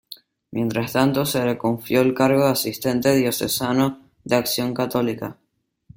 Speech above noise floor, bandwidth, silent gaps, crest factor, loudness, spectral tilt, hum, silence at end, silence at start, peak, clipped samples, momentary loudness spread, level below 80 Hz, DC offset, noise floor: 32 dB; 17 kHz; none; 18 dB; -21 LUFS; -5 dB/octave; none; 0.65 s; 0.1 s; -2 dBFS; under 0.1%; 13 LU; -56 dBFS; under 0.1%; -52 dBFS